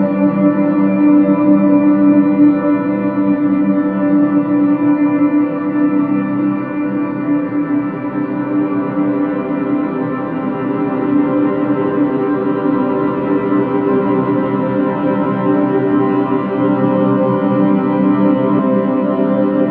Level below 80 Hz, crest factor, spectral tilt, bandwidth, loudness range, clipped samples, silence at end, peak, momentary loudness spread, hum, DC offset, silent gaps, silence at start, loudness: -56 dBFS; 12 dB; -11.5 dB/octave; 3.8 kHz; 5 LU; under 0.1%; 0 s; 0 dBFS; 7 LU; none; under 0.1%; none; 0 s; -14 LUFS